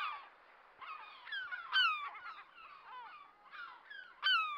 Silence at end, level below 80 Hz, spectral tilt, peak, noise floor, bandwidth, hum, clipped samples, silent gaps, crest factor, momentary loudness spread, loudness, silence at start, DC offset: 0 s; -88 dBFS; 1.5 dB/octave; -22 dBFS; -63 dBFS; 16.5 kHz; none; under 0.1%; none; 20 dB; 23 LU; -36 LUFS; 0 s; under 0.1%